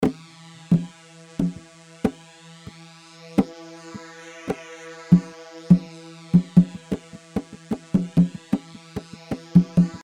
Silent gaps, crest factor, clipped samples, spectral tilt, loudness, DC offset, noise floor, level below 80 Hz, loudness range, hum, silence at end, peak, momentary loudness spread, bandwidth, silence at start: none; 22 dB; under 0.1%; -8.5 dB/octave; -23 LUFS; under 0.1%; -47 dBFS; -52 dBFS; 8 LU; none; 0.05 s; -2 dBFS; 22 LU; 9.6 kHz; 0 s